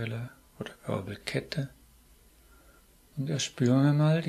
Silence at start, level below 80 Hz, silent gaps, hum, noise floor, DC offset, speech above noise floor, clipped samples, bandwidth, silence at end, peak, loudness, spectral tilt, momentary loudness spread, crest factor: 0 s; -62 dBFS; none; none; -59 dBFS; under 0.1%; 31 dB; under 0.1%; 13.5 kHz; 0 s; -12 dBFS; -30 LUFS; -6 dB/octave; 19 LU; 18 dB